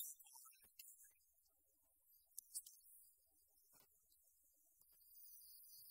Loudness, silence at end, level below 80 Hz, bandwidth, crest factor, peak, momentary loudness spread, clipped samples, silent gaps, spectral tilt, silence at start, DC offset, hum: -59 LUFS; 0 s; under -90 dBFS; 16 kHz; 32 dB; -32 dBFS; 13 LU; under 0.1%; none; 2.5 dB/octave; 0 s; under 0.1%; none